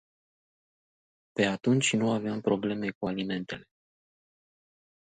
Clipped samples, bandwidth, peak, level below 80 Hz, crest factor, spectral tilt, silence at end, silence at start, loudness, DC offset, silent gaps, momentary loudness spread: under 0.1%; 9.4 kHz; -12 dBFS; -66 dBFS; 20 dB; -5 dB/octave; 1.4 s; 1.35 s; -29 LUFS; under 0.1%; 2.95-3.01 s; 12 LU